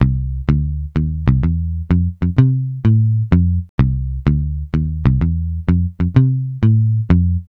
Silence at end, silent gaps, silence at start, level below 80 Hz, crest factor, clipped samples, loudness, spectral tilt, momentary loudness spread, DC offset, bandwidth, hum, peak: 0.1 s; 3.69-3.78 s; 0 s; -24 dBFS; 14 dB; under 0.1%; -17 LUFS; -11 dB/octave; 6 LU; under 0.1%; 4.6 kHz; none; 0 dBFS